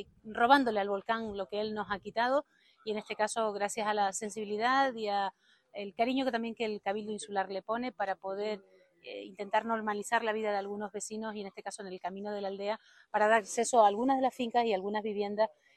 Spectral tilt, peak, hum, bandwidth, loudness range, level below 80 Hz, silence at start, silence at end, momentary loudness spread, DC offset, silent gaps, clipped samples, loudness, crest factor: -3.5 dB/octave; -10 dBFS; none; 13 kHz; 6 LU; -72 dBFS; 0 s; 0.3 s; 15 LU; under 0.1%; none; under 0.1%; -32 LUFS; 22 dB